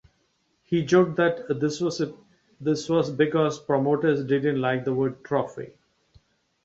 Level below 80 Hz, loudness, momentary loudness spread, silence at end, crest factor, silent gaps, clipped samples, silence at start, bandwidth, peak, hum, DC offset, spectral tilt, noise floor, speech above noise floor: -64 dBFS; -25 LUFS; 10 LU; 1 s; 18 dB; none; under 0.1%; 0.7 s; 8 kHz; -8 dBFS; none; under 0.1%; -6.5 dB/octave; -70 dBFS; 46 dB